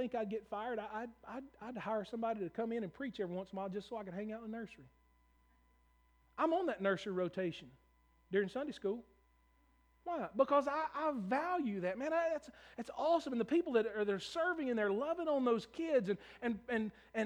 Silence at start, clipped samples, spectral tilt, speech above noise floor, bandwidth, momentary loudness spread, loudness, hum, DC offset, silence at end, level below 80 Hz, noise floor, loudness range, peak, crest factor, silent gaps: 0 s; under 0.1%; -6.5 dB/octave; 34 dB; over 20 kHz; 12 LU; -38 LUFS; none; under 0.1%; 0 s; -72 dBFS; -72 dBFS; 7 LU; -18 dBFS; 20 dB; none